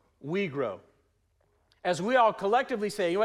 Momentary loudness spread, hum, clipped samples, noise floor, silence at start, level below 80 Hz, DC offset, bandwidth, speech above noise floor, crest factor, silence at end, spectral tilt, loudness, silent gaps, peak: 11 LU; none; under 0.1%; -71 dBFS; 0.25 s; -70 dBFS; under 0.1%; 14.5 kHz; 43 dB; 18 dB; 0 s; -5 dB/octave; -28 LUFS; none; -12 dBFS